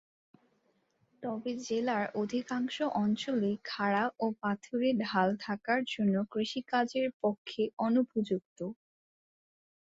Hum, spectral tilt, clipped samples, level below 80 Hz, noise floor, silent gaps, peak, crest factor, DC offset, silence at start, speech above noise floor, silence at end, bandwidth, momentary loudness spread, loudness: none; -6 dB/octave; under 0.1%; -76 dBFS; -74 dBFS; 7.14-7.20 s, 7.38-7.45 s, 7.73-7.77 s, 8.45-8.56 s; -14 dBFS; 18 dB; under 0.1%; 1.2 s; 42 dB; 1.1 s; 7.8 kHz; 7 LU; -33 LUFS